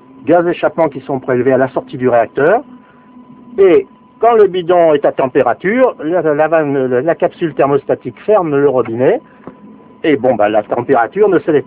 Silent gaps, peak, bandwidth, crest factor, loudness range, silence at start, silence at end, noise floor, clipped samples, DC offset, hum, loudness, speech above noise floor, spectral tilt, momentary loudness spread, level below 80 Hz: none; 0 dBFS; 4 kHz; 12 dB; 3 LU; 0.25 s; 0.05 s; -40 dBFS; under 0.1%; under 0.1%; none; -13 LUFS; 28 dB; -10.5 dB/octave; 7 LU; -54 dBFS